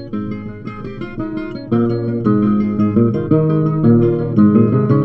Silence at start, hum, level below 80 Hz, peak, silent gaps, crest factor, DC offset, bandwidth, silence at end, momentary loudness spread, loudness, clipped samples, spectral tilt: 0 s; none; -40 dBFS; 0 dBFS; none; 14 dB; under 0.1%; 5.4 kHz; 0 s; 15 LU; -15 LUFS; under 0.1%; -12 dB/octave